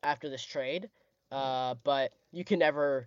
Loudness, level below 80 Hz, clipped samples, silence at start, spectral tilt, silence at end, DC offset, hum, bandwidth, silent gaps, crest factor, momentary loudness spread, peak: -32 LUFS; -80 dBFS; under 0.1%; 0.05 s; -5 dB/octave; 0 s; under 0.1%; none; 7.6 kHz; none; 18 dB; 12 LU; -14 dBFS